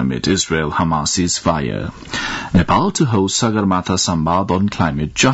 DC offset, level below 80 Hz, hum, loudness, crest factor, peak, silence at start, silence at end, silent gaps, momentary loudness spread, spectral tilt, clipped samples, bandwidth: under 0.1%; -38 dBFS; none; -17 LUFS; 14 dB; -2 dBFS; 0 s; 0 s; none; 7 LU; -4.5 dB/octave; under 0.1%; 8.2 kHz